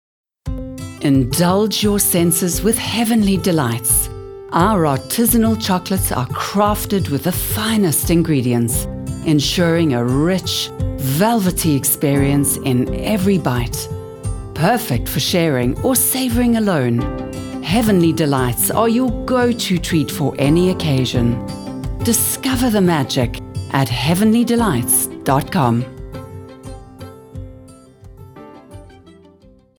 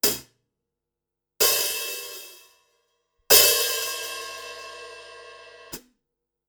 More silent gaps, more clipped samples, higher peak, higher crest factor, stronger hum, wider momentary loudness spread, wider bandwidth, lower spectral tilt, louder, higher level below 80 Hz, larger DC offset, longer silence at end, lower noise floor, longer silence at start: neither; neither; about the same, 0 dBFS vs -2 dBFS; second, 16 dB vs 26 dB; neither; second, 13 LU vs 26 LU; about the same, over 20 kHz vs over 20 kHz; first, -5 dB/octave vs 1 dB/octave; first, -16 LUFS vs -20 LUFS; first, -34 dBFS vs -60 dBFS; neither; about the same, 0.7 s vs 0.7 s; second, -48 dBFS vs -86 dBFS; first, 0.45 s vs 0.05 s